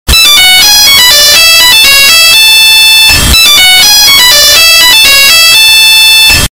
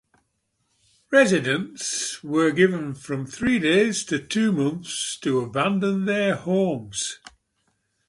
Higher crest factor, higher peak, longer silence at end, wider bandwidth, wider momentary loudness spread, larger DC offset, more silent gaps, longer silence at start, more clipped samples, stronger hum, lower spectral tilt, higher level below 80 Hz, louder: second, 2 dB vs 20 dB; first, 0 dBFS vs -4 dBFS; second, 0.05 s vs 0.9 s; first, over 20 kHz vs 11.5 kHz; second, 0 LU vs 10 LU; neither; neither; second, 0.1 s vs 1.1 s; first, 20% vs under 0.1%; neither; second, 0.5 dB/octave vs -4.5 dB/octave; first, -20 dBFS vs -60 dBFS; first, 1 LUFS vs -23 LUFS